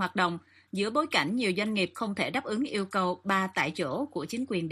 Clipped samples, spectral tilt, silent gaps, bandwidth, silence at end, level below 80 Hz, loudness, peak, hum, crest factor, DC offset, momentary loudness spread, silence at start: under 0.1%; -5 dB/octave; none; 15 kHz; 0 s; -72 dBFS; -29 LUFS; -12 dBFS; none; 18 dB; under 0.1%; 7 LU; 0 s